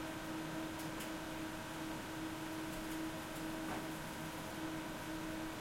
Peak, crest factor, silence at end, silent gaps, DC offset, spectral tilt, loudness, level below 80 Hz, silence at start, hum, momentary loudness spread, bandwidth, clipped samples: -30 dBFS; 14 dB; 0 s; none; under 0.1%; -4 dB/octave; -44 LUFS; -60 dBFS; 0 s; none; 2 LU; 16.5 kHz; under 0.1%